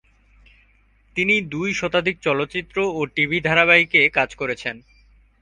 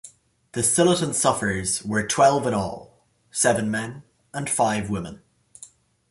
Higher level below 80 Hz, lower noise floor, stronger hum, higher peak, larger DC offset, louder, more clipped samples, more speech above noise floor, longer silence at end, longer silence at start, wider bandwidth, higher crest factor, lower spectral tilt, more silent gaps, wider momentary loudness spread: about the same, -52 dBFS vs -52 dBFS; first, -57 dBFS vs -50 dBFS; neither; first, 0 dBFS vs -4 dBFS; neither; first, -19 LUFS vs -22 LUFS; neither; first, 37 dB vs 27 dB; first, 0.65 s vs 0.45 s; first, 1.15 s vs 0.05 s; second, 10 kHz vs 12 kHz; about the same, 22 dB vs 20 dB; about the same, -4.5 dB/octave vs -3.5 dB/octave; neither; second, 12 LU vs 15 LU